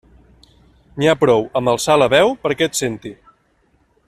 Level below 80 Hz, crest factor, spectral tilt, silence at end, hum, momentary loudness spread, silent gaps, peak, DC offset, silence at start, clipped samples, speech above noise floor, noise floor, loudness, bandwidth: -50 dBFS; 18 dB; -4 dB/octave; 0.95 s; none; 16 LU; none; 0 dBFS; under 0.1%; 0.95 s; under 0.1%; 44 dB; -60 dBFS; -16 LUFS; 14 kHz